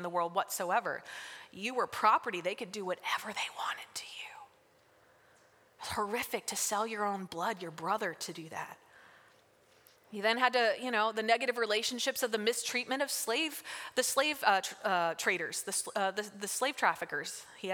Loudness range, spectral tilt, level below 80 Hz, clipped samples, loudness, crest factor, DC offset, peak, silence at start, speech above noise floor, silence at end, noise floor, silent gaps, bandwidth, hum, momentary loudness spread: 8 LU; -1.5 dB/octave; -76 dBFS; under 0.1%; -33 LUFS; 24 dB; under 0.1%; -10 dBFS; 0 s; 32 dB; 0 s; -66 dBFS; none; over 20 kHz; none; 13 LU